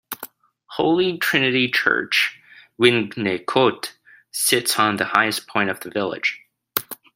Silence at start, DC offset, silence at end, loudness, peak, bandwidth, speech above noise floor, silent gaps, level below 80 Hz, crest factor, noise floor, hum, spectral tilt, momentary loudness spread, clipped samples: 0.1 s; under 0.1%; 0.2 s; -20 LUFS; 0 dBFS; 16 kHz; 22 dB; none; -66 dBFS; 22 dB; -42 dBFS; none; -3 dB/octave; 15 LU; under 0.1%